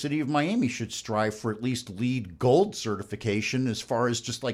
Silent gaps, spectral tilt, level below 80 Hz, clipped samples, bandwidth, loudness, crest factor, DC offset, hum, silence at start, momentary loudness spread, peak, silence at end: none; -5 dB/octave; -62 dBFS; under 0.1%; 15 kHz; -28 LUFS; 18 dB; under 0.1%; none; 0 s; 8 LU; -10 dBFS; 0 s